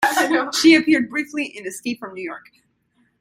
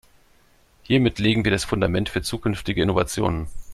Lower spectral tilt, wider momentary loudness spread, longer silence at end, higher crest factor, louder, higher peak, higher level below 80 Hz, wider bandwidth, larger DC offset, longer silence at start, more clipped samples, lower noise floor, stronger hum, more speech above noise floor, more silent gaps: second, -2.5 dB/octave vs -5.5 dB/octave; first, 18 LU vs 6 LU; first, 0.8 s vs 0 s; about the same, 18 dB vs 18 dB; first, -18 LUFS vs -22 LUFS; about the same, -2 dBFS vs -4 dBFS; second, -64 dBFS vs -40 dBFS; first, 16 kHz vs 14 kHz; neither; second, 0 s vs 0.9 s; neither; first, -64 dBFS vs -57 dBFS; neither; first, 45 dB vs 35 dB; neither